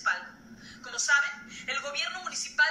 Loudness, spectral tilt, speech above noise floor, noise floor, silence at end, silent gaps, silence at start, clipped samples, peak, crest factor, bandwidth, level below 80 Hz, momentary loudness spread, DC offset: -29 LUFS; 1 dB/octave; 19 dB; -49 dBFS; 0 s; none; 0 s; under 0.1%; -12 dBFS; 18 dB; 12.5 kHz; -68 dBFS; 21 LU; under 0.1%